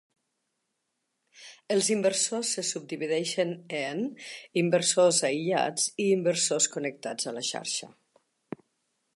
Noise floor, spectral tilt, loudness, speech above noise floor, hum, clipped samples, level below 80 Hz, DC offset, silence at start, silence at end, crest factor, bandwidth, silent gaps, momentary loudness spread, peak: -80 dBFS; -3 dB/octave; -27 LUFS; 53 dB; none; under 0.1%; -82 dBFS; under 0.1%; 1.4 s; 1.3 s; 18 dB; 11.5 kHz; none; 11 LU; -10 dBFS